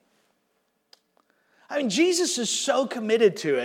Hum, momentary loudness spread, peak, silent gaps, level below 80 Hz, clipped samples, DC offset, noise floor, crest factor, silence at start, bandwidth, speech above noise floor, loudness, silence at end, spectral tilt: none; 5 LU; -8 dBFS; none; under -90 dBFS; under 0.1%; under 0.1%; -72 dBFS; 18 dB; 1.7 s; 16.5 kHz; 49 dB; -23 LUFS; 0 s; -3 dB/octave